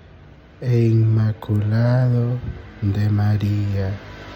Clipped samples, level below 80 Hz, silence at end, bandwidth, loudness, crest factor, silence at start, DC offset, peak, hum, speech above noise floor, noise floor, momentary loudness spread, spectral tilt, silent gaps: under 0.1%; -44 dBFS; 0 s; 6.2 kHz; -20 LUFS; 12 dB; 0.6 s; under 0.1%; -8 dBFS; none; 26 dB; -44 dBFS; 11 LU; -9.5 dB/octave; none